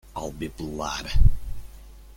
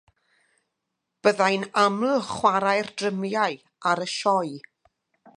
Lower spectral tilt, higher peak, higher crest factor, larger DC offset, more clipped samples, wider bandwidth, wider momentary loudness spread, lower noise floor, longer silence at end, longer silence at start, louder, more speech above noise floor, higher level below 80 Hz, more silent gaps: first, -5.5 dB/octave vs -4 dB/octave; about the same, -4 dBFS vs -4 dBFS; about the same, 18 dB vs 22 dB; neither; neither; about the same, 11 kHz vs 11 kHz; first, 21 LU vs 7 LU; second, -45 dBFS vs -81 dBFS; second, 0.3 s vs 0.8 s; second, 0.15 s vs 1.25 s; second, -28 LUFS vs -24 LUFS; second, 24 dB vs 58 dB; first, -26 dBFS vs -68 dBFS; neither